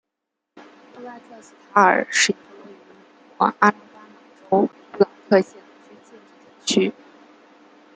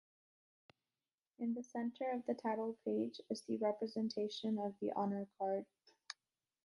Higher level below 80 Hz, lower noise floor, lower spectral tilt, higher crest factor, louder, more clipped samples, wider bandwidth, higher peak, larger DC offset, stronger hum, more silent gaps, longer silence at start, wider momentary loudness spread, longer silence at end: first, -72 dBFS vs -88 dBFS; second, -81 dBFS vs under -90 dBFS; second, -3.5 dB/octave vs -6 dB/octave; about the same, 22 dB vs 18 dB; first, -20 LUFS vs -41 LUFS; neither; second, 9.6 kHz vs 11 kHz; first, -2 dBFS vs -26 dBFS; neither; neither; neither; second, 1 s vs 1.4 s; first, 23 LU vs 8 LU; first, 1.05 s vs 0.55 s